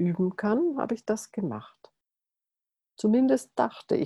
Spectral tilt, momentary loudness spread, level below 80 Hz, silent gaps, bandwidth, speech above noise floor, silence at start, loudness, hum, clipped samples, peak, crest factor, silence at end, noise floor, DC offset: -7 dB/octave; 10 LU; -70 dBFS; none; 12.5 kHz; 62 dB; 0 s; -27 LUFS; none; under 0.1%; -10 dBFS; 18 dB; 0 s; -89 dBFS; under 0.1%